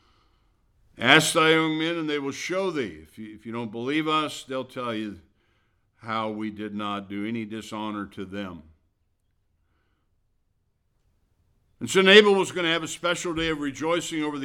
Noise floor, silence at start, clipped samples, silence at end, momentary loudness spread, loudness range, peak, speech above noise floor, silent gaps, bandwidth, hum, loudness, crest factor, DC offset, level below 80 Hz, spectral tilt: -71 dBFS; 0.95 s; under 0.1%; 0 s; 18 LU; 15 LU; 0 dBFS; 46 dB; none; 17 kHz; none; -24 LUFS; 26 dB; under 0.1%; -60 dBFS; -3.5 dB/octave